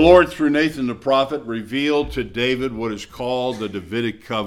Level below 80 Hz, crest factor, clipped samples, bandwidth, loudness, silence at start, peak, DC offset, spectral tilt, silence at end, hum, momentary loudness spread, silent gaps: -40 dBFS; 18 dB; under 0.1%; 14 kHz; -21 LUFS; 0 s; 0 dBFS; under 0.1%; -5.5 dB/octave; 0 s; none; 9 LU; none